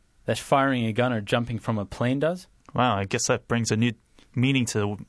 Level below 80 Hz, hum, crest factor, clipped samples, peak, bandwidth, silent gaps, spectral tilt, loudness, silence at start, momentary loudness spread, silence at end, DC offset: -54 dBFS; none; 18 dB; under 0.1%; -8 dBFS; 11 kHz; none; -5 dB/octave; -25 LUFS; 0.25 s; 7 LU; 0.05 s; under 0.1%